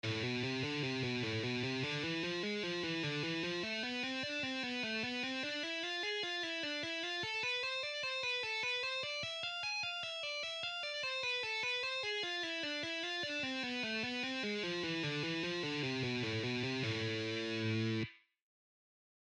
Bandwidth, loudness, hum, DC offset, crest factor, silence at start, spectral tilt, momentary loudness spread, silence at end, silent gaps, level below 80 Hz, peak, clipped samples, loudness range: 10.5 kHz; -37 LUFS; none; under 0.1%; 12 dB; 0.05 s; -4 dB/octave; 2 LU; 1.05 s; none; -76 dBFS; -26 dBFS; under 0.1%; 1 LU